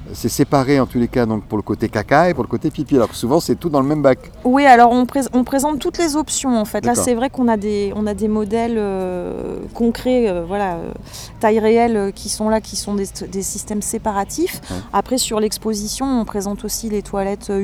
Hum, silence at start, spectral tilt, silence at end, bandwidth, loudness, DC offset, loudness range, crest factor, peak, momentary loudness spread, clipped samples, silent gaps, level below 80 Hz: none; 0 s; -5 dB/octave; 0 s; 17.5 kHz; -18 LUFS; under 0.1%; 6 LU; 18 dB; 0 dBFS; 9 LU; under 0.1%; none; -40 dBFS